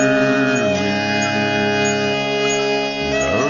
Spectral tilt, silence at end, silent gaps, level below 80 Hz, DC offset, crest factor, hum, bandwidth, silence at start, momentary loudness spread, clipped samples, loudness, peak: -4 dB/octave; 0 s; none; -46 dBFS; under 0.1%; 14 dB; none; 7.4 kHz; 0 s; 3 LU; under 0.1%; -17 LUFS; -4 dBFS